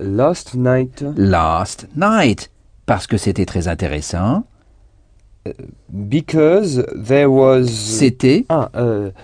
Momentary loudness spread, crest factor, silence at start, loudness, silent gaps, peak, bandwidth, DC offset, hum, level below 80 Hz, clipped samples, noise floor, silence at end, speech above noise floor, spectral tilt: 18 LU; 16 dB; 0 s; -16 LUFS; none; 0 dBFS; 10 kHz; under 0.1%; none; -38 dBFS; under 0.1%; -49 dBFS; 0.1 s; 34 dB; -6 dB/octave